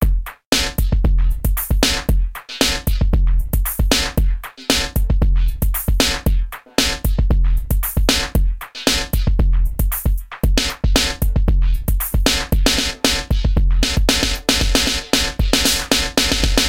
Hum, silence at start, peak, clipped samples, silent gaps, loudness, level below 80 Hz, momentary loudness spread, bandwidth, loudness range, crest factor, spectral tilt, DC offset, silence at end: none; 0 s; -2 dBFS; under 0.1%; 0.46-0.52 s; -18 LUFS; -18 dBFS; 5 LU; 17 kHz; 2 LU; 14 dB; -3.5 dB/octave; 1%; 0 s